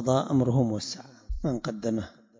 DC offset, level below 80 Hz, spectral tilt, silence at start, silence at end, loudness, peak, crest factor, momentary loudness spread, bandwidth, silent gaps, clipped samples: under 0.1%; -44 dBFS; -7 dB/octave; 0 s; 0.3 s; -28 LUFS; -12 dBFS; 16 dB; 12 LU; 7.6 kHz; none; under 0.1%